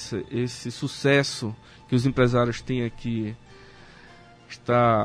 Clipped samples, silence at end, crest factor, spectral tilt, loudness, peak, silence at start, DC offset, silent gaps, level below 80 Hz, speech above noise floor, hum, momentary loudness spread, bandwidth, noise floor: under 0.1%; 0 s; 20 dB; -6 dB/octave; -25 LUFS; -6 dBFS; 0 s; under 0.1%; none; -50 dBFS; 25 dB; none; 14 LU; 10.5 kHz; -49 dBFS